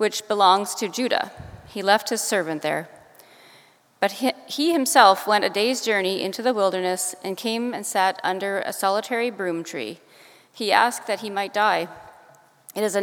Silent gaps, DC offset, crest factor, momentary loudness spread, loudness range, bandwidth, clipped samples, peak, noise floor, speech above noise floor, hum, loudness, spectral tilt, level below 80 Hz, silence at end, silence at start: none; under 0.1%; 22 dB; 11 LU; 5 LU; over 20 kHz; under 0.1%; 0 dBFS; -54 dBFS; 32 dB; none; -22 LUFS; -2.5 dB/octave; -64 dBFS; 0 s; 0 s